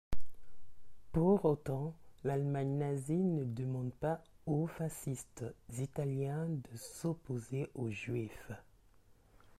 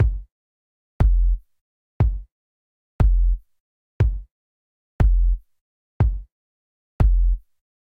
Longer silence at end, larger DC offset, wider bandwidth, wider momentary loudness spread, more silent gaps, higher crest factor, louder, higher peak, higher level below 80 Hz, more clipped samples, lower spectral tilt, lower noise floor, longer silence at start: first, 1 s vs 0.6 s; neither; first, 15 kHz vs 3 kHz; about the same, 12 LU vs 11 LU; second, none vs 0.32-1.00 s, 1.61-2.00 s, 2.32-2.99 s, 3.60-4.00 s, 4.31-4.99 s, 5.61-6.00 s, 6.32-6.99 s; about the same, 18 dB vs 16 dB; second, -38 LUFS vs -23 LUFS; second, -18 dBFS vs -6 dBFS; second, -56 dBFS vs -22 dBFS; neither; second, -7.5 dB/octave vs -10 dB/octave; second, -64 dBFS vs under -90 dBFS; about the same, 0.1 s vs 0 s